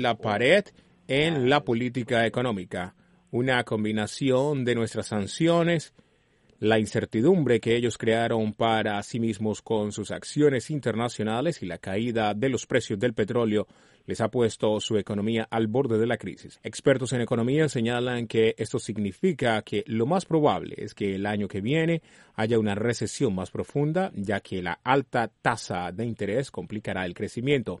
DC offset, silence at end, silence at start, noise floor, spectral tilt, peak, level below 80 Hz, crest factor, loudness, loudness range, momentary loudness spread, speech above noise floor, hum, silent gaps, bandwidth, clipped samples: under 0.1%; 0.05 s; 0 s; -63 dBFS; -5.5 dB/octave; -6 dBFS; -60 dBFS; 20 dB; -26 LUFS; 3 LU; 8 LU; 38 dB; none; none; 11.5 kHz; under 0.1%